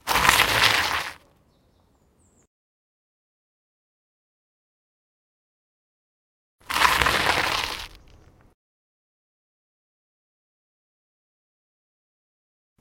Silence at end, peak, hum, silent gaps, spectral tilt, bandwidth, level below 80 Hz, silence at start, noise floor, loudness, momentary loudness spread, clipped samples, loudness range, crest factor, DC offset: 4.85 s; 0 dBFS; none; 2.47-6.59 s; -1.5 dB/octave; 16.5 kHz; -48 dBFS; 0.05 s; -62 dBFS; -20 LUFS; 16 LU; under 0.1%; 11 LU; 28 dB; under 0.1%